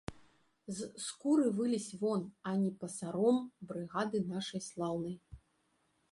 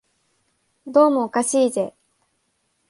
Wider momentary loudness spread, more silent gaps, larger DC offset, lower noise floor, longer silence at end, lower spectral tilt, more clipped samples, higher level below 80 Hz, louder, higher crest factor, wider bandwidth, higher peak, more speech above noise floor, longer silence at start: first, 13 LU vs 9 LU; neither; neither; first, -76 dBFS vs -70 dBFS; second, 0.75 s vs 1 s; first, -5.5 dB/octave vs -4 dB/octave; neither; first, -66 dBFS vs -72 dBFS; second, -36 LUFS vs -19 LUFS; about the same, 18 dB vs 18 dB; about the same, 11.5 kHz vs 11.5 kHz; second, -20 dBFS vs -4 dBFS; second, 41 dB vs 51 dB; second, 0.1 s vs 0.85 s